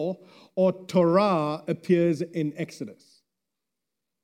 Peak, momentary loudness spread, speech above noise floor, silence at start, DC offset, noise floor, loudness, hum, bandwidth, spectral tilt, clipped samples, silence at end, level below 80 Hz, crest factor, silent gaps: -8 dBFS; 15 LU; 61 dB; 0 s; under 0.1%; -86 dBFS; -25 LUFS; none; 12 kHz; -7.5 dB/octave; under 0.1%; 1.3 s; -76 dBFS; 18 dB; none